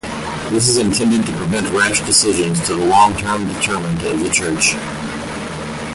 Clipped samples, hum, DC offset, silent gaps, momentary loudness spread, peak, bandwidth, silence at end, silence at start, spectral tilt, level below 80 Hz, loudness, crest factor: under 0.1%; none; under 0.1%; none; 12 LU; 0 dBFS; 12 kHz; 0 s; 0.05 s; -3.5 dB/octave; -40 dBFS; -16 LUFS; 16 dB